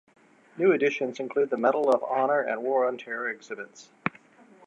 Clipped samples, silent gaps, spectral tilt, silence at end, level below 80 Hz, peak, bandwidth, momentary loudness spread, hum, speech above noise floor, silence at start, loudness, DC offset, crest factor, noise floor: under 0.1%; none; -6 dB/octave; 0.6 s; -78 dBFS; -6 dBFS; 9.6 kHz; 12 LU; none; 29 dB; 0.55 s; -26 LUFS; under 0.1%; 20 dB; -55 dBFS